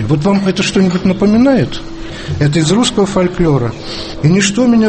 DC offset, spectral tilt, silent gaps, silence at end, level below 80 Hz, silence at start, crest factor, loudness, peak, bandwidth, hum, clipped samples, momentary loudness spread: under 0.1%; -5.5 dB/octave; none; 0 s; -32 dBFS; 0 s; 12 dB; -12 LUFS; 0 dBFS; 8.8 kHz; none; under 0.1%; 13 LU